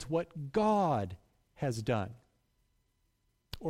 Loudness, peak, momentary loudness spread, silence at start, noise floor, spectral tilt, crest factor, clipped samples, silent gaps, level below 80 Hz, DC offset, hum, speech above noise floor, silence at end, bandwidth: -33 LUFS; -18 dBFS; 16 LU; 0 s; -76 dBFS; -7 dB/octave; 16 dB; under 0.1%; none; -60 dBFS; under 0.1%; none; 44 dB; 0 s; 15.5 kHz